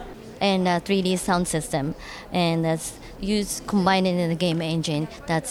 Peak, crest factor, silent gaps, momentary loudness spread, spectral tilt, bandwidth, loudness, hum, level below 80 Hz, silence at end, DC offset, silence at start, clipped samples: -6 dBFS; 18 dB; none; 8 LU; -5 dB/octave; 15.5 kHz; -24 LUFS; none; -46 dBFS; 0 s; under 0.1%; 0 s; under 0.1%